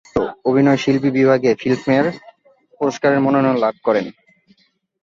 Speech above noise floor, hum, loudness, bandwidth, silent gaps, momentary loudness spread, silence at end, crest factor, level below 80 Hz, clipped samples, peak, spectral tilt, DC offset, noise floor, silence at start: 45 dB; none; -17 LUFS; 7.4 kHz; none; 8 LU; 0.9 s; 16 dB; -54 dBFS; under 0.1%; -2 dBFS; -7 dB/octave; under 0.1%; -61 dBFS; 0.15 s